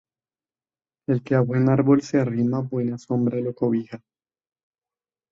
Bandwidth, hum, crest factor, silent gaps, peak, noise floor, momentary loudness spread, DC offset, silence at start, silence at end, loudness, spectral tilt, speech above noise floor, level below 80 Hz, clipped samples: 7.6 kHz; none; 18 dB; none; -6 dBFS; under -90 dBFS; 9 LU; under 0.1%; 1.1 s; 1.35 s; -22 LUFS; -9 dB/octave; over 69 dB; -62 dBFS; under 0.1%